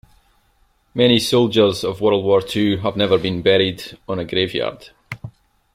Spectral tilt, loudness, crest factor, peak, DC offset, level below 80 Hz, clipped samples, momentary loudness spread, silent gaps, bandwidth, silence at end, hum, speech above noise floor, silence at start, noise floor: -5.5 dB/octave; -18 LUFS; 18 dB; -2 dBFS; under 0.1%; -52 dBFS; under 0.1%; 16 LU; none; 15.5 kHz; 0.45 s; none; 42 dB; 0.95 s; -60 dBFS